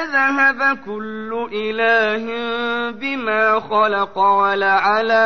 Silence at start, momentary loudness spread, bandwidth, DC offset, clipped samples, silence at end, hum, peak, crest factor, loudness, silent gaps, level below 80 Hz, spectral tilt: 0 s; 10 LU; 6.6 kHz; 0.8%; under 0.1%; 0 s; none; -6 dBFS; 12 dB; -17 LUFS; none; -58 dBFS; -4.5 dB/octave